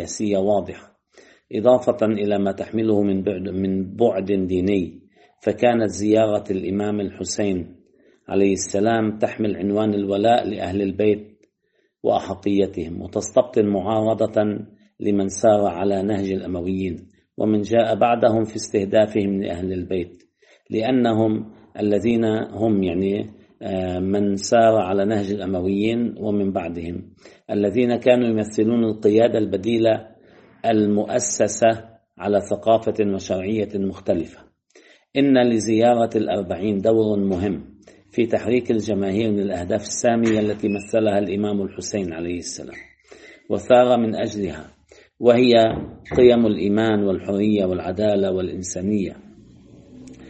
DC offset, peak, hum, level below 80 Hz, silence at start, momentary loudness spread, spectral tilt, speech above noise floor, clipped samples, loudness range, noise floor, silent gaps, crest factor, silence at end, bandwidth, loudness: under 0.1%; -2 dBFS; none; -56 dBFS; 0 s; 10 LU; -6 dB/octave; 48 dB; under 0.1%; 3 LU; -68 dBFS; none; 20 dB; 0 s; 8.8 kHz; -21 LUFS